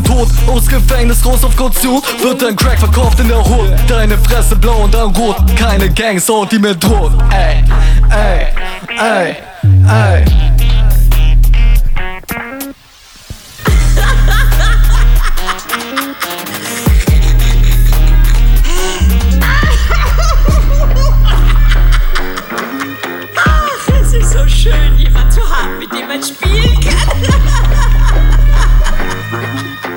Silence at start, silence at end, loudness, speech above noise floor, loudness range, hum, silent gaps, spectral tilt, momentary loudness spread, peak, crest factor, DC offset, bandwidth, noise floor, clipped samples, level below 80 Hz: 0 s; 0 s; -12 LUFS; 30 dB; 2 LU; none; none; -5 dB/octave; 8 LU; 0 dBFS; 8 dB; under 0.1%; 17.5 kHz; -38 dBFS; under 0.1%; -10 dBFS